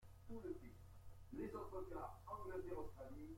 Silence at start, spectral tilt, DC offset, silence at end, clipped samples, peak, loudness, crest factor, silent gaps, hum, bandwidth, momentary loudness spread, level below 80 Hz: 0 s; -7.5 dB/octave; under 0.1%; 0 s; under 0.1%; -38 dBFS; -53 LUFS; 14 dB; none; none; 16.5 kHz; 12 LU; -62 dBFS